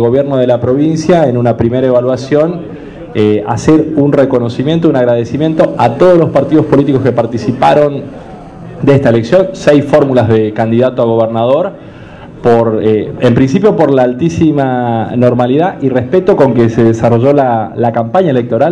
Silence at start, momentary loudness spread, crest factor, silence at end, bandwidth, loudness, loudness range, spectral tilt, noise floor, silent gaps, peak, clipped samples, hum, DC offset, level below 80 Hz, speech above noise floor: 0 s; 5 LU; 10 dB; 0 s; 10.5 kHz; -10 LUFS; 2 LU; -8 dB/octave; -29 dBFS; none; 0 dBFS; 2%; none; under 0.1%; -40 dBFS; 20 dB